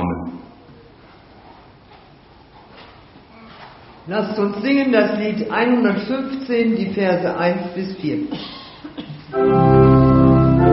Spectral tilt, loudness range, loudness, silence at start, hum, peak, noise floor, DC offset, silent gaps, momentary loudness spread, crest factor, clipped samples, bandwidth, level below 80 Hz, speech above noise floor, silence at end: -7 dB/octave; 12 LU; -17 LUFS; 0 s; none; -2 dBFS; -46 dBFS; under 0.1%; none; 21 LU; 16 dB; under 0.1%; 5.8 kHz; -36 dBFS; 27 dB; 0 s